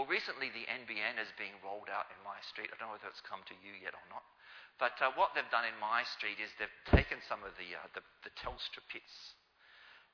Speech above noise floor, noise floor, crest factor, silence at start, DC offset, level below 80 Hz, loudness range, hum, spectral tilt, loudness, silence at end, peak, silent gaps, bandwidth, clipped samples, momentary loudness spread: 23 dB; -63 dBFS; 30 dB; 0 s; under 0.1%; -50 dBFS; 10 LU; none; -6 dB/octave; -38 LUFS; 0.15 s; -10 dBFS; none; 5.4 kHz; under 0.1%; 19 LU